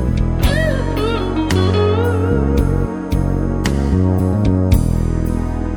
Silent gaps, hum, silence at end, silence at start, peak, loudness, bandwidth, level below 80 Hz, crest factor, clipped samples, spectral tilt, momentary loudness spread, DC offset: none; none; 0 s; 0 s; 0 dBFS; -17 LUFS; 19 kHz; -22 dBFS; 16 dB; under 0.1%; -7 dB/octave; 4 LU; under 0.1%